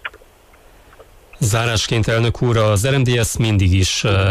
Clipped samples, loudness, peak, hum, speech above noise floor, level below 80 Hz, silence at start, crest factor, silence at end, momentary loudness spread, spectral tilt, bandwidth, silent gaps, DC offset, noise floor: under 0.1%; -16 LUFS; -6 dBFS; none; 32 dB; -36 dBFS; 0.05 s; 12 dB; 0 s; 3 LU; -5 dB/octave; 15.5 kHz; none; under 0.1%; -47 dBFS